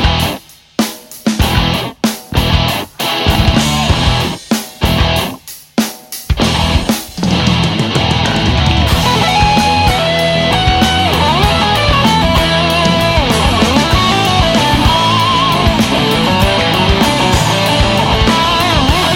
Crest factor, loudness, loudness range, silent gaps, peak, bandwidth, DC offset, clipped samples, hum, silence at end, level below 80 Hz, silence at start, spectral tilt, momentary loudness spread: 12 dB; -11 LUFS; 4 LU; none; 0 dBFS; 17 kHz; under 0.1%; under 0.1%; none; 0 s; -22 dBFS; 0 s; -4.5 dB/octave; 7 LU